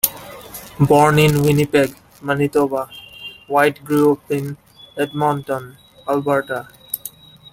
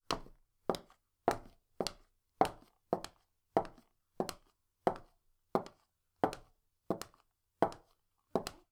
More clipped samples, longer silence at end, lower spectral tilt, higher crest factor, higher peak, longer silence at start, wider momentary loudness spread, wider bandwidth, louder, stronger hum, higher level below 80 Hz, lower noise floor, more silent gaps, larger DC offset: neither; first, 0.45 s vs 0.2 s; about the same, -5.5 dB/octave vs -4.5 dB/octave; second, 18 dB vs 32 dB; first, 0 dBFS vs -10 dBFS; about the same, 0.05 s vs 0.1 s; first, 20 LU vs 13 LU; second, 17 kHz vs over 20 kHz; first, -18 LUFS vs -39 LUFS; neither; first, -50 dBFS vs -62 dBFS; second, -38 dBFS vs -76 dBFS; neither; neither